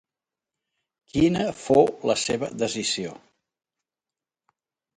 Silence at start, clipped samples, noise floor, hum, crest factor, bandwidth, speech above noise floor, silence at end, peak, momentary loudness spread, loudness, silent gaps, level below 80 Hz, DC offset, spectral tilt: 1.15 s; under 0.1%; under -90 dBFS; none; 24 dB; 11 kHz; over 67 dB; 1.8 s; -4 dBFS; 9 LU; -23 LUFS; none; -54 dBFS; under 0.1%; -4.5 dB/octave